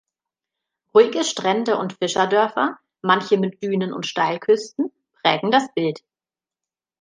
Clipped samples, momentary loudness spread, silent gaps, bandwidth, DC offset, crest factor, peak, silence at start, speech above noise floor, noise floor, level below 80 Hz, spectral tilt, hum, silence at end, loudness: under 0.1%; 9 LU; none; 9.8 kHz; under 0.1%; 20 dB; -2 dBFS; 0.95 s; over 70 dB; under -90 dBFS; -72 dBFS; -4.5 dB/octave; none; 1.05 s; -20 LUFS